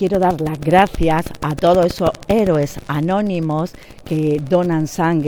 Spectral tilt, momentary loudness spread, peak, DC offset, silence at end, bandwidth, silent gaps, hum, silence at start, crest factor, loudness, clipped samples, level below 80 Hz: -7 dB/octave; 8 LU; 0 dBFS; under 0.1%; 0 s; 20 kHz; none; none; 0 s; 16 dB; -17 LUFS; under 0.1%; -34 dBFS